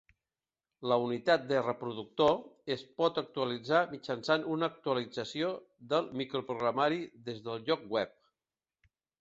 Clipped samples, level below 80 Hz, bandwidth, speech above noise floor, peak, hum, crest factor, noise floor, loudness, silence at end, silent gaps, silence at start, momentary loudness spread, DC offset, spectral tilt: under 0.1%; -74 dBFS; 7.8 kHz; over 57 dB; -14 dBFS; none; 20 dB; under -90 dBFS; -33 LUFS; 1.1 s; none; 0.8 s; 10 LU; under 0.1%; -5.5 dB/octave